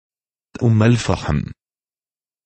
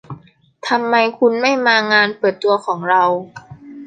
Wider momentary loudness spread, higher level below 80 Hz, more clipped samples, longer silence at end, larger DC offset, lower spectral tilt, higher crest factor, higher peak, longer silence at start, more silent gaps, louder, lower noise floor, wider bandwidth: about the same, 9 LU vs 8 LU; first, -38 dBFS vs -62 dBFS; neither; first, 0.95 s vs 0 s; neither; first, -7 dB/octave vs -4.5 dB/octave; about the same, 18 dB vs 16 dB; about the same, -2 dBFS vs -2 dBFS; first, 0.6 s vs 0.1 s; neither; second, -18 LUFS vs -15 LUFS; first, under -90 dBFS vs -43 dBFS; about the same, 8.8 kHz vs 9.2 kHz